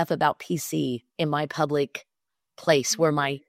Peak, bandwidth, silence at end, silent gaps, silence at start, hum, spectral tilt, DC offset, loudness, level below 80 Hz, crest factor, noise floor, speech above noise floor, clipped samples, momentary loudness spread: -4 dBFS; 16 kHz; 0.1 s; none; 0 s; none; -4.5 dB/octave; under 0.1%; -25 LUFS; -68 dBFS; 20 dB; -83 dBFS; 58 dB; under 0.1%; 8 LU